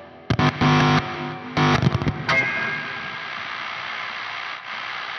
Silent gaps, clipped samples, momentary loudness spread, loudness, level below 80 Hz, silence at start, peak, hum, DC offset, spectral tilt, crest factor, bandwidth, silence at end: none; under 0.1%; 12 LU; -22 LUFS; -46 dBFS; 0 s; -4 dBFS; none; under 0.1%; -6 dB/octave; 18 dB; 7 kHz; 0 s